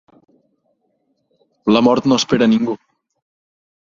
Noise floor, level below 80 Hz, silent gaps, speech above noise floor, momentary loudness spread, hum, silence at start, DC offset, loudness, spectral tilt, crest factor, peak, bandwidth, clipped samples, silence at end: -66 dBFS; -56 dBFS; none; 52 dB; 10 LU; none; 1.65 s; under 0.1%; -15 LUFS; -5 dB/octave; 18 dB; -2 dBFS; 7.6 kHz; under 0.1%; 1.1 s